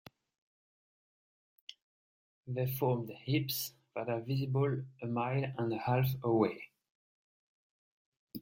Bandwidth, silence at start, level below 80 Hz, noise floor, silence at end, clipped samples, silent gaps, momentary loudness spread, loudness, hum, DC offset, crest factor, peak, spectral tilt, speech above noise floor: 16.5 kHz; 1.7 s; -72 dBFS; under -90 dBFS; 0 s; under 0.1%; 1.82-2.43 s, 6.90-8.28 s; 21 LU; -35 LUFS; none; under 0.1%; 22 dB; -16 dBFS; -6.5 dB/octave; over 56 dB